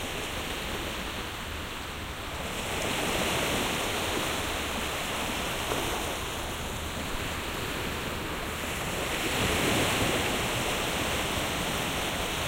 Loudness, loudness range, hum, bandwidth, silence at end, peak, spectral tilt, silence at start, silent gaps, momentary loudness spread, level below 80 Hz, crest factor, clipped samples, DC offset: -30 LUFS; 4 LU; none; 16 kHz; 0 s; -14 dBFS; -3 dB/octave; 0 s; none; 8 LU; -42 dBFS; 18 dB; under 0.1%; under 0.1%